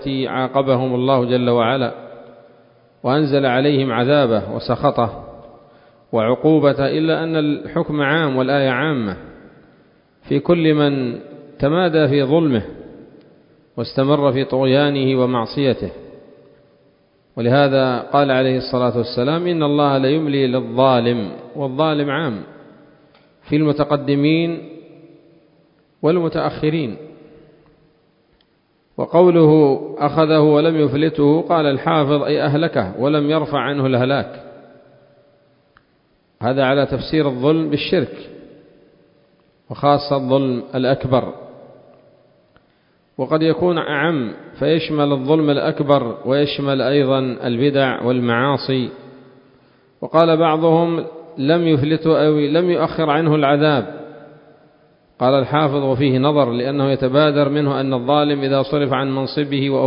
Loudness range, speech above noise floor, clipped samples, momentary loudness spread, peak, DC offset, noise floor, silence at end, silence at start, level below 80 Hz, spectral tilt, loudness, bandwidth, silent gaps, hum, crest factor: 5 LU; 44 dB; under 0.1%; 9 LU; 0 dBFS; under 0.1%; -60 dBFS; 0 s; 0 s; -52 dBFS; -10.5 dB/octave; -17 LUFS; 5.4 kHz; none; none; 18 dB